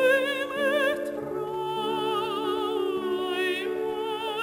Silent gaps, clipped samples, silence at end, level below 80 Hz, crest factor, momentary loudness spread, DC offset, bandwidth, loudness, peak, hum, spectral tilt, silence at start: none; under 0.1%; 0 s; -64 dBFS; 14 dB; 7 LU; under 0.1%; 16 kHz; -27 LUFS; -12 dBFS; none; -4 dB/octave; 0 s